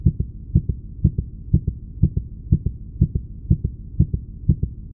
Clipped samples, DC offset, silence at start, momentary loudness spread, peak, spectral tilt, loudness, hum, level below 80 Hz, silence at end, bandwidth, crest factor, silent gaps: under 0.1%; under 0.1%; 0 s; 7 LU; -2 dBFS; -21.5 dB/octave; -24 LUFS; none; -28 dBFS; 0 s; 0.9 kHz; 20 dB; none